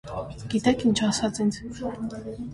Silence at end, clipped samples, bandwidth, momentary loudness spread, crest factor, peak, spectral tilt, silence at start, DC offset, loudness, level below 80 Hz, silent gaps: 0 s; under 0.1%; 11.5 kHz; 13 LU; 16 dB; -10 dBFS; -5 dB/octave; 0.05 s; under 0.1%; -26 LUFS; -48 dBFS; none